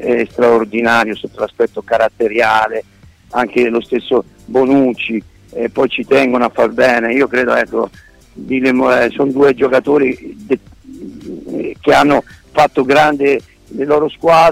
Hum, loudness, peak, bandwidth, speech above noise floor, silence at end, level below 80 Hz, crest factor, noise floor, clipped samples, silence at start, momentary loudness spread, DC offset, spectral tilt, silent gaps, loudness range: none; -14 LUFS; -2 dBFS; 15.5 kHz; 19 dB; 0 s; -46 dBFS; 12 dB; -32 dBFS; under 0.1%; 0 s; 12 LU; under 0.1%; -5.5 dB/octave; none; 2 LU